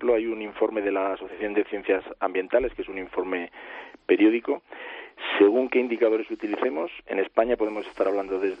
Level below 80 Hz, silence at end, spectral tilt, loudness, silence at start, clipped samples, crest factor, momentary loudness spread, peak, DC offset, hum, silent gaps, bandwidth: -56 dBFS; 0 s; -6.5 dB/octave; -25 LUFS; 0 s; under 0.1%; 20 dB; 13 LU; -6 dBFS; under 0.1%; none; none; 5.4 kHz